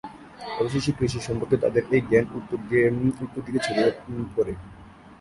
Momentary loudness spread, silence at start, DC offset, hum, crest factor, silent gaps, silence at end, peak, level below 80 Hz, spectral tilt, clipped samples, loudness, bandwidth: 12 LU; 0.05 s; under 0.1%; none; 18 dB; none; 0.05 s; -6 dBFS; -50 dBFS; -6.5 dB/octave; under 0.1%; -25 LUFS; 11.5 kHz